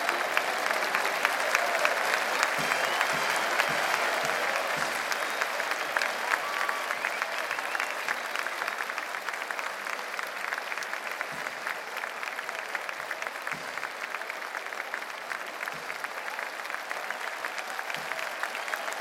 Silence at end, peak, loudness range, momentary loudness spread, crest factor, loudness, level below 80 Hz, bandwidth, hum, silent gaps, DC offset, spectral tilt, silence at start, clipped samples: 0 s; -4 dBFS; 8 LU; 9 LU; 26 dB; -30 LUFS; -76 dBFS; 16.5 kHz; none; none; under 0.1%; -0.5 dB/octave; 0 s; under 0.1%